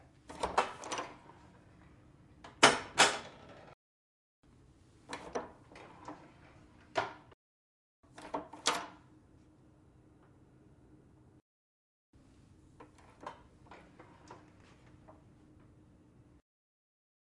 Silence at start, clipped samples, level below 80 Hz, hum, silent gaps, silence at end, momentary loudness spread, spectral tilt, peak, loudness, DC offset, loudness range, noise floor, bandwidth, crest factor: 0.3 s; under 0.1%; -68 dBFS; none; 3.74-4.43 s, 7.34-8.03 s, 11.41-12.13 s; 2.2 s; 30 LU; -1.5 dB/octave; -6 dBFS; -33 LUFS; under 0.1%; 25 LU; -63 dBFS; 12 kHz; 34 dB